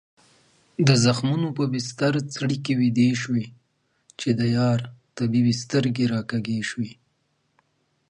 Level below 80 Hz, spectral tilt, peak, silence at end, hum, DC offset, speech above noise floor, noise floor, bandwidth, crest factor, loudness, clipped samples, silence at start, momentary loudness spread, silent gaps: -60 dBFS; -6 dB/octave; -6 dBFS; 1.15 s; none; under 0.1%; 48 dB; -70 dBFS; 10.5 kHz; 18 dB; -23 LUFS; under 0.1%; 0.8 s; 10 LU; none